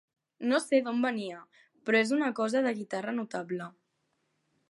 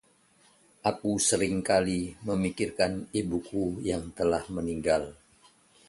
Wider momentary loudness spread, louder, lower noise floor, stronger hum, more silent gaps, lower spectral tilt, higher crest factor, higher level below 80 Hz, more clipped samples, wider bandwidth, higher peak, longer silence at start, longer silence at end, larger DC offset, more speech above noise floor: first, 13 LU vs 7 LU; about the same, -30 LUFS vs -29 LUFS; first, -77 dBFS vs -63 dBFS; neither; neither; about the same, -4.5 dB/octave vs -4.5 dB/octave; about the same, 18 dB vs 18 dB; second, -86 dBFS vs -52 dBFS; neither; about the same, 11.5 kHz vs 11.5 kHz; about the same, -12 dBFS vs -12 dBFS; second, 0.4 s vs 0.85 s; first, 1 s vs 0.75 s; neither; first, 48 dB vs 35 dB